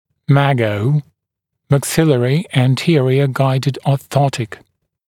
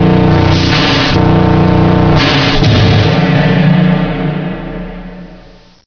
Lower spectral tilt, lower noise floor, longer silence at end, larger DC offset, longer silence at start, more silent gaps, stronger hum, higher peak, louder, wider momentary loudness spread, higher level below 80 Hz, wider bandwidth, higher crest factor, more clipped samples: about the same, -6.5 dB/octave vs -7 dB/octave; first, -78 dBFS vs -38 dBFS; about the same, 0.55 s vs 0.5 s; neither; first, 0.3 s vs 0 s; neither; neither; about the same, 0 dBFS vs 0 dBFS; second, -16 LUFS vs -9 LUFS; second, 5 LU vs 13 LU; second, -52 dBFS vs -24 dBFS; first, 16 kHz vs 5.4 kHz; first, 16 dB vs 10 dB; neither